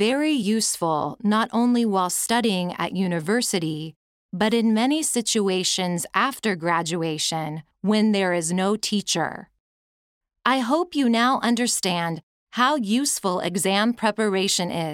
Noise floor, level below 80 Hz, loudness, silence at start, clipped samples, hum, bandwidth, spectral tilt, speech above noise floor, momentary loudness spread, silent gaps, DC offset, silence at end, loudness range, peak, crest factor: under -90 dBFS; -66 dBFS; -22 LUFS; 0 s; under 0.1%; none; 16.5 kHz; -3.5 dB/octave; over 68 dB; 6 LU; 3.96-4.29 s, 9.60-10.21 s, 12.23-12.47 s; under 0.1%; 0 s; 2 LU; -4 dBFS; 20 dB